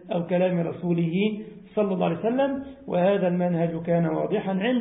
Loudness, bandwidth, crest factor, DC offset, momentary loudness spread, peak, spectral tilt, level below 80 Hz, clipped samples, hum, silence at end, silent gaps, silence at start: -25 LUFS; 3.9 kHz; 14 dB; under 0.1%; 5 LU; -12 dBFS; -12 dB/octave; -62 dBFS; under 0.1%; none; 0 s; none; 0 s